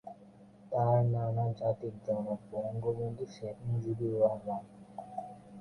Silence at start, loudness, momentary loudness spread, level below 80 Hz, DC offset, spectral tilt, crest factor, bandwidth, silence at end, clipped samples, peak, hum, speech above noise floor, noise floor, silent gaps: 0.05 s; -34 LUFS; 15 LU; -66 dBFS; under 0.1%; -10 dB/octave; 18 dB; 9.6 kHz; 0 s; under 0.1%; -16 dBFS; none; 24 dB; -57 dBFS; none